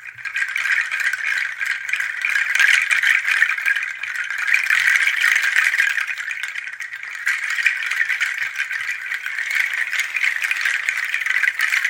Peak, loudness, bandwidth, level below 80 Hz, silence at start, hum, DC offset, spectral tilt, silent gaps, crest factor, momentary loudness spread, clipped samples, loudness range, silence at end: 0 dBFS; -18 LUFS; 17 kHz; -78 dBFS; 0 s; none; under 0.1%; 4 dB/octave; none; 20 dB; 9 LU; under 0.1%; 5 LU; 0 s